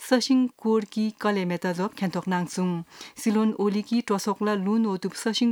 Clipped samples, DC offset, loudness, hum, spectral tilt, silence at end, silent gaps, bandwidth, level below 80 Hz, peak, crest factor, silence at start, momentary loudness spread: under 0.1%; under 0.1%; -26 LUFS; none; -5.5 dB/octave; 0 s; none; 18.5 kHz; -74 dBFS; -8 dBFS; 16 dB; 0 s; 6 LU